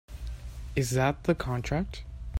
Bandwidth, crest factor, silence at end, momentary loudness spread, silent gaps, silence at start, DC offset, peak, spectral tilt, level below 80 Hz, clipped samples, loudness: 16 kHz; 18 dB; 0 s; 15 LU; none; 0.1 s; under 0.1%; -12 dBFS; -6 dB/octave; -40 dBFS; under 0.1%; -30 LUFS